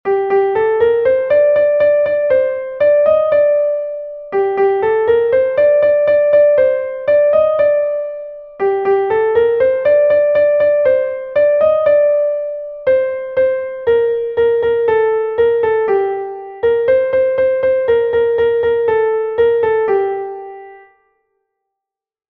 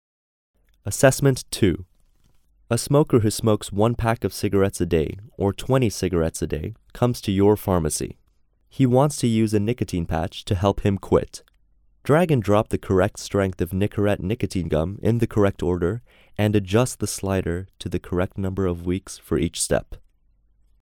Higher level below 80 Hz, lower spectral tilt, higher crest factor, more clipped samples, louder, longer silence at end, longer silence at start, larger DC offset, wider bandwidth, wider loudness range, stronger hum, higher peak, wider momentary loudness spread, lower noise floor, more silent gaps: second, -52 dBFS vs -42 dBFS; first, -8 dB/octave vs -6 dB/octave; second, 12 dB vs 22 dB; neither; first, -14 LUFS vs -22 LUFS; first, 1.55 s vs 1 s; second, 0.05 s vs 0.85 s; neither; second, 4.5 kHz vs 19 kHz; about the same, 3 LU vs 3 LU; neither; about the same, -2 dBFS vs 0 dBFS; about the same, 8 LU vs 10 LU; first, -83 dBFS vs -61 dBFS; neither